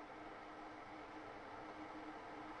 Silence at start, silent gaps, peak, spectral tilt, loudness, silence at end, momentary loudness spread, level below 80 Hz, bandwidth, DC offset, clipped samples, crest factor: 0 s; none; -40 dBFS; -5 dB/octave; -53 LUFS; 0 s; 2 LU; -72 dBFS; 10.5 kHz; under 0.1%; under 0.1%; 14 dB